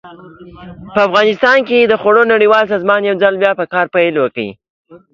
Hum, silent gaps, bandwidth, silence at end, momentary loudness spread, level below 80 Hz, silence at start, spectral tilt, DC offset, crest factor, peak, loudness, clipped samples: none; 4.70-4.85 s; 7.2 kHz; 0.15 s; 7 LU; -54 dBFS; 0.05 s; -5.5 dB/octave; under 0.1%; 12 dB; 0 dBFS; -12 LUFS; under 0.1%